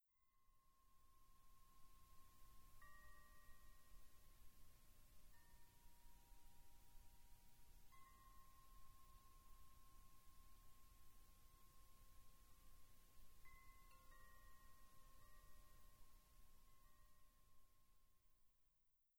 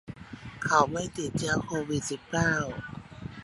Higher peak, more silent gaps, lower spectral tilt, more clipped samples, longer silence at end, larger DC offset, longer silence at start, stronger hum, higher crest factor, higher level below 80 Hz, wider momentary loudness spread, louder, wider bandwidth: second, -52 dBFS vs -8 dBFS; neither; second, -3 dB/octave vs -4.5 dB/octave; neither; about the same, 0 s vs 0 s; neither; about the same, 0 s vs 0.05 s; first, 60 Hz at -85 dBFS vs none; second, 14 dB vs 22 dB; second, -70 dBFS vs -52 dBFS; second, 2 LU vs 19 LU; second, -69 LUFS vs -29 LUFS; first, over 20 kHz vs 11.5 kHz